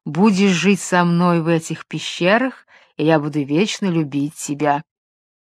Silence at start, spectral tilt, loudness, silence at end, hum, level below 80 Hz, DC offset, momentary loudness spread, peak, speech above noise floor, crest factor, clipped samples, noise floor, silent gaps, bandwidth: 0.05 s; -5.5 dB/octave; -18 LUFS; 0.7 s; none; -66 dBFS; under 0.1%; 9 LU; 0 dBFS; over 72 dB; 18 dB; under 0.1%; under -90 dBFS; none; 13.5 kHz